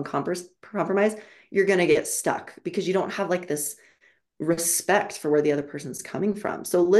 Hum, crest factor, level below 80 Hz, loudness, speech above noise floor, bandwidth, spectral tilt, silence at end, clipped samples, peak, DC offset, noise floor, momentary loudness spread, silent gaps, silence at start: none; 18 dB; -68 dBFS; -25 LUFS; 38 dB; 12.5 kHz; -4 dB/octave; 0 s; under 0.1%; -6 dBFS; under 0.1%; -62 dBFS; 12 LU; none; 0 s